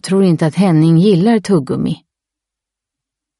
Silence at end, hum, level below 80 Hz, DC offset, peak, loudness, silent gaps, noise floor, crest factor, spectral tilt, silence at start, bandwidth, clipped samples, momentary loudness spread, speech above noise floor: 1.45 s; none; -52 dBFS; under 0.1%; -2 dBFS; -13 LUFS; none; -83 dBFS; 12 dB; -7.5 dB/octave; 0.05 s; 11.5 kHz; under 0.1%; 9 LU; 72 dB